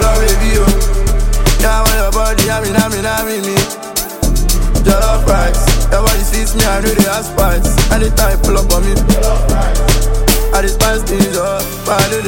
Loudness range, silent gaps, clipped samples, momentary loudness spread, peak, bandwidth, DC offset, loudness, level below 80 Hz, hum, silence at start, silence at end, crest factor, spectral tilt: 1 LU; none; under 0.1%; 4 LU; 0 dBFS; 17 kHz; under 0.1%; -13 LUFS; -14 dBFS; none; 0 s; 0 s; 10 dB; -4 dB/octave